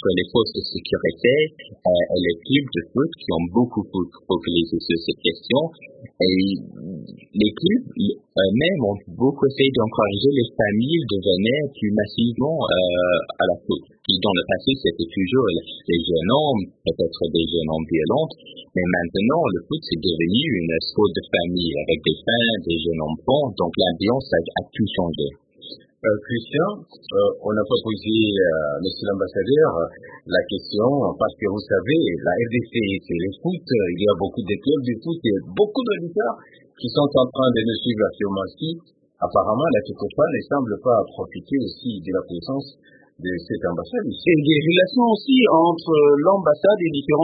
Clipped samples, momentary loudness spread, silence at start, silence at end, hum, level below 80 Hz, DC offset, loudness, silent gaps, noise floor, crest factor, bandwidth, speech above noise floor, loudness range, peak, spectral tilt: under 0.1%; 9 LU; 0 s; 0 s; none; -50 dBFS; under 0.1%; -21 LUFS; none; -42 dBFS; 18 dB; 5 kHz; 22 dB; 3 LU; -2 dBFS; -11 dB/octave